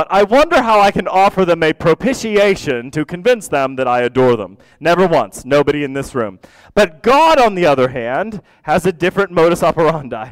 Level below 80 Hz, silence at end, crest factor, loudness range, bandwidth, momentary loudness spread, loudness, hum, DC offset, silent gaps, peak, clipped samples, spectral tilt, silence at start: -42 dBFS; 0 s; 10 dB; 2 LU; 16 kHz; 9 LU; -14 LUFS; none; 0.2%; none; -4 dBFS; under 0.1%; -5.5 dB/octave; 0 s